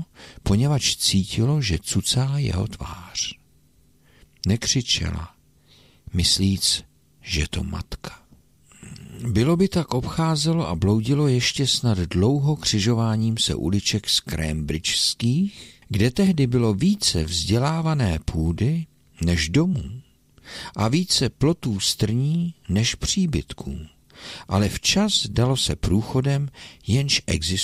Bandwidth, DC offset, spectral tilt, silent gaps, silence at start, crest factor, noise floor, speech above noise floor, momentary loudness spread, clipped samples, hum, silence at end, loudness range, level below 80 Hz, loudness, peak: 16 kHz; under 0.1%; -4.5 dB/octave; none; 0 s; 16 dB; -58 dBFS; 37 dB; 13 LU; under 0.1%; none; 0 s; 4 LU; -38 dBFS; -22 LUFS; -6 dBFS